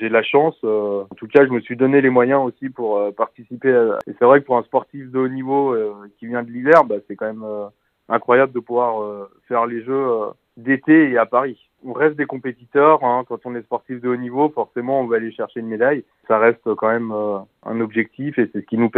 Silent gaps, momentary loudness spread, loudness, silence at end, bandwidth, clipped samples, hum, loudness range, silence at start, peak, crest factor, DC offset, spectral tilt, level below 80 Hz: none; 14 LU; -19 LUFS; 0 s; 5.2 kHz; under 0.1%; none; 3 LU; 0 s; 0 dBFS; 18 dB; under 0.1%; -8.5 dB/octave; -70 dBFS